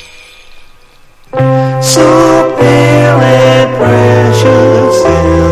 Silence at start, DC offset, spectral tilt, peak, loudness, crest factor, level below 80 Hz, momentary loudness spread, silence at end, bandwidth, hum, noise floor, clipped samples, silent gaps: 0.55 s; under 0.1%; -5.5 dB/octave; 0 dBFS; -7 LUFS; 8 dB; -26 dBFS; 4 LU; 0 s; 15.5 kHz; none; -38 dBFS; 1%; none